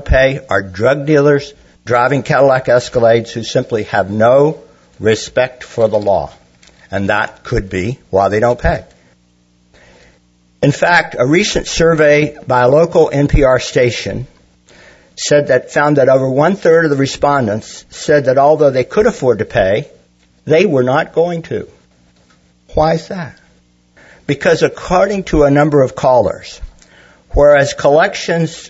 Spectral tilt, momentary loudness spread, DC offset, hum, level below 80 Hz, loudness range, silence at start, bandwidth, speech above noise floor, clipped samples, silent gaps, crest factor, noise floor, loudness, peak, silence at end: -5.5 dB/octave; 12 LU; under 0.1%; none; -30 dBFS; 5 LU; 0 s; 8 kHz; 41 dB; under 0.1%; none; 14 dB; -53 dBFS; -13 LUFS; 0 dBFS; 0 s